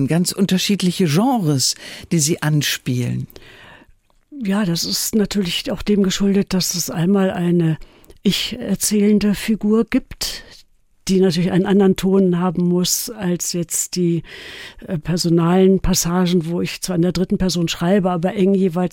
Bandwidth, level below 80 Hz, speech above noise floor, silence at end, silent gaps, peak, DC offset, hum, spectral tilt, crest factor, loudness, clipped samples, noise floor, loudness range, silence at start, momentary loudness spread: 17 kHz; -40 dBFS; 35 dB; 0.05 s; none; -2 dBFS; under 0.1%; none; -5 dB/octave; 14 dB; -18 LUFS; under 0.1%; -53 dBFS; 3 LU; 0 s; 9 LU